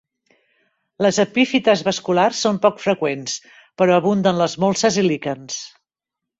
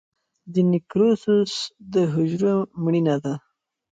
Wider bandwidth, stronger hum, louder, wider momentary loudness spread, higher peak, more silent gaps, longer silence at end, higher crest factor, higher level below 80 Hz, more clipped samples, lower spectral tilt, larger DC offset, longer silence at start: second, 8 kHz vs 9 kHz; neither; first, -18 LUFS vs -22 LUFS; first, 12 LU vs 7 LU; first, -2 dBFS vs -8 dBFS; neither; about the same, 0.7 s vs 0.6 s; about the same, 18 dB vs 14 dB; about the same, -60 dBFS vs -64 dBFS; neither; second, -4.5 dB/octave vs -7 dB/octave; neither; first, 1 s vs 0.45 s